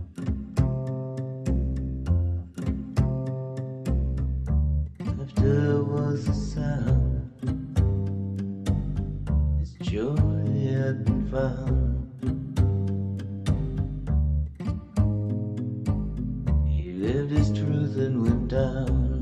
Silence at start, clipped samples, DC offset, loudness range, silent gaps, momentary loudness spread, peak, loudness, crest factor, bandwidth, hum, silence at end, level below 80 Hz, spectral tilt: 0 s; under 0.1%; under 0.1%; 3 LU; none; 7 LU; -10 dBFS; -27 LUFS; 16 dB; 10 kHz; none; 0 s; -32 dBFS; -9 dB/octave